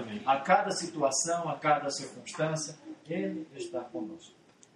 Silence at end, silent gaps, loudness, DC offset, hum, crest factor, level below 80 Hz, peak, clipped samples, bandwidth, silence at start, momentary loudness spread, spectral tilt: 0.45 s; none; -31 LUFS; under 0.1%; none; 22 dB; -78 dBFS; -10 dBFS; under 0.1%; 12 kHz; 0 s; 14 LU; -3.5 dB/octave